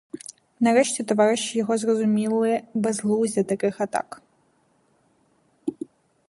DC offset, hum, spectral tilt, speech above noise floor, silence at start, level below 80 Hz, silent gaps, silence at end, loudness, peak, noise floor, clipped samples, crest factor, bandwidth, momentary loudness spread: under 0.1%; none; -4.5 dB/octave; 42 dB; 0.15 s; -72 dBFS; none; 0.45 s; -23 LUFS; -6 dBFS; -64 dBFS; under 0.1%; 18 dB; 11.5 kHz; 18 LU